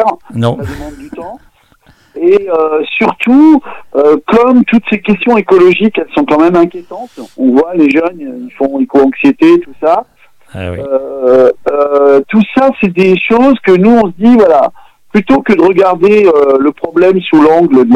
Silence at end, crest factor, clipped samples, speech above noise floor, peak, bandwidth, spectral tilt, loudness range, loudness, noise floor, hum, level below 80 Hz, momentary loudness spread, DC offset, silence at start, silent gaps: 0 s; 8 dB; under 0.1%; 38 dB; 0 dBFS; 9.8 kHz; -7.5 dB/octave; 3 LU; -8 LUFS; -46 dBFS; none; -42 dBFS; 13 LU; under 0.1%; 0 s; none